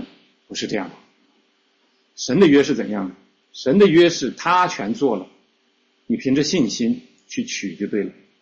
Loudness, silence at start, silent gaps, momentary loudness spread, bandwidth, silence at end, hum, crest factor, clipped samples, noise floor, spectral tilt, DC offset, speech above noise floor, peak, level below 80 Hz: -19 LUFS; 0 s; none; 17 LU; 7.8 kHz; 0.3 s; none; 16 dB; under 0.1%; -63 dBFS; -5 dB/octave; under 0.1%; 45 dB; -4 dBFS; -60 dBFS